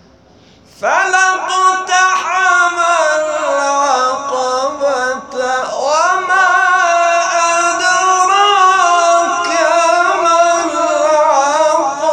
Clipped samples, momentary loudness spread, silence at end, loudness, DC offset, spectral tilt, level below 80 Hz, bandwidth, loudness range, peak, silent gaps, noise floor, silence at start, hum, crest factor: under 0.1%; 6 LU; 0 s; -12 LUFS; under 0.1%; 0 dB/octave; -60 dBFS; 10.5 kHz; 3 LU; 0 dBFS; none; -45 dBFS; 0.8 s; none; 12 dB